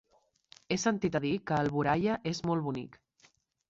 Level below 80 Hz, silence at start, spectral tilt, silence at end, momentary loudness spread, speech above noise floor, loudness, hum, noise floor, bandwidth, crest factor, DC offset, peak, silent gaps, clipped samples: -62 dBFS; 0.7 s; -5.5 dB/octave; 0.8 s; 8 LU; 37 dB; -31 LUFS; none; -67 dBFS; 8 kHz; 18 dB; under 0.1%; -14 dBFS; none; under 0.1%